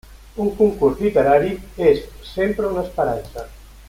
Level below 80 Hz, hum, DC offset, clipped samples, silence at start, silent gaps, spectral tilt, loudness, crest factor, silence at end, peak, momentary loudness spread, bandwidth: -40 dBFS; none; under 0.1%; under 0.1%; 0.1 s; none; -7 dB/octave; -19 LUFS; 18 dB; 0.05 s; -2 dBFS; 17 LU; 16 kHz